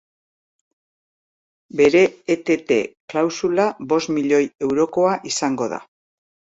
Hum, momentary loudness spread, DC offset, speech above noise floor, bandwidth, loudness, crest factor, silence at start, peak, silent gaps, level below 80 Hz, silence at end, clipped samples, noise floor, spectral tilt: none; 9 LU; under 0.1%; over 71 dB; 8 kHz; -19 LUFS; 16 dB; 1.75 s; -4 dBFS; 3.00-3.08 s; -62 dBFS; 0.75 s; under 0.1%; under -90 dBFS; -4.5 dB/octave